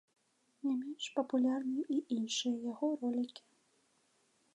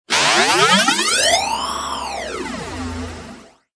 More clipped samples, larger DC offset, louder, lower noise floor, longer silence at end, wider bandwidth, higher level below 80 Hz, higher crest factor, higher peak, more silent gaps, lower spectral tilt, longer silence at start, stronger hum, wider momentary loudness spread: neither; neither; second, -36 LUFS vs -16 LUFS; first, -74 dBFS vs -40 dBFS; first, 1.15 s vs 0.35 s; about the same, 10.5 kHz vs 11 kHz; second, under -90 dBFS vs -44 dBFS; about the same, 18 dB vs 16 dB; second, -20 dBFS vs -2 dBFS; neither; first, -3.5 dB/octave vs -1.5 dB/octave; first, 0.65 s vs 0.1 s; neither; second, 6 LU vs 15 LU